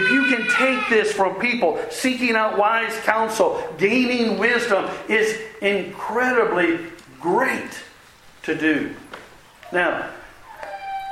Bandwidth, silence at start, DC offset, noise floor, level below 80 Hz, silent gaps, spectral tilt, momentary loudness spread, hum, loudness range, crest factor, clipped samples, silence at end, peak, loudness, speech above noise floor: 16 kHz; 0 s; under 0.1%; -48 dBFS; -58 dBFS; none; -4 dB/octave; 15 LU; none; 6 LU; 20 dB; under 0.1%; 0 s; 0 dBFS; -20 LUFS; 28 dB